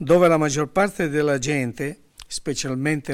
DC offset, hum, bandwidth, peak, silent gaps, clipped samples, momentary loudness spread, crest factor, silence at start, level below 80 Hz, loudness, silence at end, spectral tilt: under 0.1%; none; 16 kHz; -6 dBFS; none; under 0.1%; 14 LU; 16 dB; 0 s; -50 dBFS; -22 LUFS; 0 s; -5 dB/octave